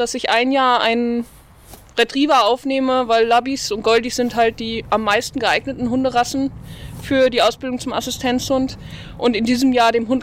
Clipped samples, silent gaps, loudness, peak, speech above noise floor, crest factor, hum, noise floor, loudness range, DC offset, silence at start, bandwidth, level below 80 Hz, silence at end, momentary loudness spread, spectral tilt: under 0.1%; none; -18 LUFS; -2 dBFS; 25 dB; 16 dB; none; -43 dBFS; 3 LU; under 0.1%; 0 s; 16 kHz; -44 dBFS; 0 s; 11 LU; -3.5 dB/octave